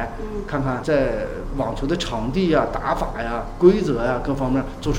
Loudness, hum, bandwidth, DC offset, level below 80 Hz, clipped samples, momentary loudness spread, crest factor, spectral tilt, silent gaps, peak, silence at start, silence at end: -22 LUFS; none; 15.5 kHz; under 0.1%; -32 dBFS; under 0.1%; 10 LU; 20 dB; -6.5 dB/octave; none; -2 dBFS; 0 s; 0 s